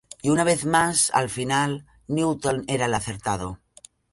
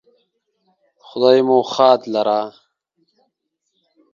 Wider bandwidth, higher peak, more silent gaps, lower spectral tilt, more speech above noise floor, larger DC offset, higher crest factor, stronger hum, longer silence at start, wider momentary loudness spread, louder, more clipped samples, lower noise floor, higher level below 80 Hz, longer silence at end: first, 12 kHz vs 7.2 kHz; second, -6 dBFS vs 0 dBFS; neither; second, -4 dB/octave vs -5.5 dB/octave; second, 29 dB vs 59 dB; neither; about the same, 18 dB vs 20 dB; neither; second, 0.25 s vs 1.15 s; about the same, 10 LU vs 12 LU; second, -23 LUFS vs -16 LUFS; neither; second, -52 dBFS vs -73 dBFS; first, -52 dBFS vs -70 dBFS; second, 0.6 s vs 1.65 s